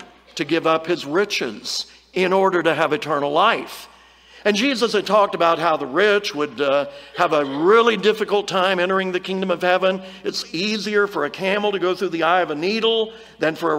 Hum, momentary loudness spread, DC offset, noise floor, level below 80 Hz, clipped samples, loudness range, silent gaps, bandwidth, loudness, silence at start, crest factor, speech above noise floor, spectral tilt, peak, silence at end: none; 8 LU; under 0.1%; -48 dBFS; -64 dBFS; under 0.1%; 2 LU; none; 16 kHz; -20 LUFS; 0 s; 18 dB; 28 dB; -4 dB/octave; -2 dBFS; 0 s